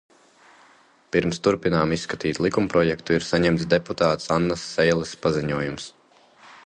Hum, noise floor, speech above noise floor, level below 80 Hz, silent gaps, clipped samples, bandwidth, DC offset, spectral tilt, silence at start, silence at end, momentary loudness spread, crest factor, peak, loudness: none; -56 dBFS; 33 dB; -48 dBFS; none; under 0.1%; 9.6 kHz; under 0.1%; -5.5 dB/octave; 1.15 s; 0.1 s; 6 LU; 20 dB; -4 dBFS; -23 LUFS